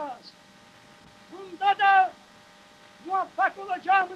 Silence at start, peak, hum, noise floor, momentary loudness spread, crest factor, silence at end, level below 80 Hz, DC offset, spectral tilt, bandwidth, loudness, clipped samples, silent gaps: 0 s; -10 dBFS; none; -53 dBFS; 25 LU; 18 dB; 0 s; -76 dBFS; under 0.1%; -3 dB/octave; 9 kHz; -24 LUFS; under 0.1%; none